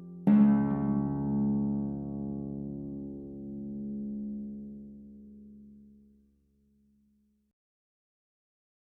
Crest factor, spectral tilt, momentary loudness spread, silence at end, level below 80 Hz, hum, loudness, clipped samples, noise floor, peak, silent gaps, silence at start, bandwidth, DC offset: 20 dB; -11 dB/octave; 25 LU; 3 s; -56 dBFS; none; -31 LUFS; under 0.1%; -70 dBFS; -14 dBFS; none; 0 s; 2.9 kHz; under 0.1%